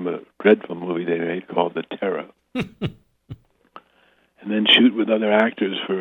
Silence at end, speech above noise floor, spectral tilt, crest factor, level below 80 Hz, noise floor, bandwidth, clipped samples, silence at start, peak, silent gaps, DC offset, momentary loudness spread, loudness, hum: 0 s; 38 dB; -6.5 dB/octave; 20 dB; -60 dBFS; -60 dBFS; 6.4 kHz; under 0.1%; 0 s; -2 dBFS; none; under 0.1%; 16 LU; -20 LUFS; none